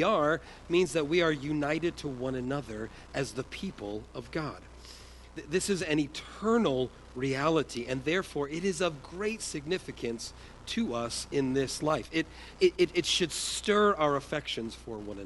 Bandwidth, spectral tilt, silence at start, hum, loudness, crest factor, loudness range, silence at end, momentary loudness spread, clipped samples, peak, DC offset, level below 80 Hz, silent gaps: 11.5 kHz; -4.5 dB/octave; 0 s; none; -31 LUFS; 18 dB; 7 LU; 0 s; 13 LU; under 0.1%; -12 dBFS; under 0.1%; -54 dBFS; none